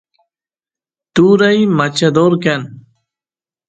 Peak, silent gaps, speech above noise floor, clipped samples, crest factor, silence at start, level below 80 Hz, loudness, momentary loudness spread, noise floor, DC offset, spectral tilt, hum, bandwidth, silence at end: 0 dBFS; none; over 79 dB; under 0.1%; 14 dB; 1.15 s; -56 dBFS; -12 LUFS; 10 LU; under -90 dBFS; under 0.1%; -6 dB/octave; none; 9.2 kHz; 0.9 s